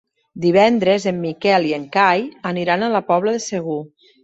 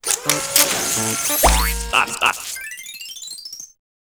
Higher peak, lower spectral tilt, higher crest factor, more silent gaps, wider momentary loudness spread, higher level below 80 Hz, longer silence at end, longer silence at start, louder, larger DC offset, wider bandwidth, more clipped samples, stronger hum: about the same, -2 dBFS vs 0 dBFS; first, -5 dB/octave vs -1.5 dB/octave; about the same, 16 dB vs 20 dB; neither; second, 10 LU vs 16 LU; second, -62 dBFS vs -30 dBFS; about the same, 0.35 s vs 0.4 s; first, 0.35 s vs 0.05 s; about the same, -18 LUFS vs -17 LUFS; neither; second, 8.2 kHz vs over 20 kHz; neither; neither